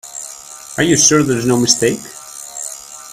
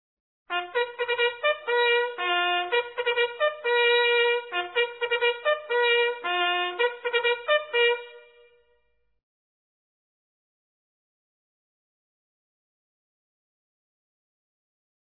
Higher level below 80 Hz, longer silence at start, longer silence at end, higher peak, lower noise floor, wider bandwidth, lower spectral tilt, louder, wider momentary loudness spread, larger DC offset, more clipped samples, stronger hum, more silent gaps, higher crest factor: first, -50 dBFS vs -80 dBFS; second, 0.05 s vs 0.5 s; second, 0 s vs 6.85 s; first, 0 dBFS vs -10 dBFS; second, -34 dBFS vs -72 dBFS; first, 16 kHz vs 4.1 kHz; about the same, -3 dB/octave vs -3 dB/octave; first, -12 LUFS vs -24 LUFS; first, 20 LU vs 6 LU; neither; neither; neither; neither; about the same, 16 dB vs 18 dB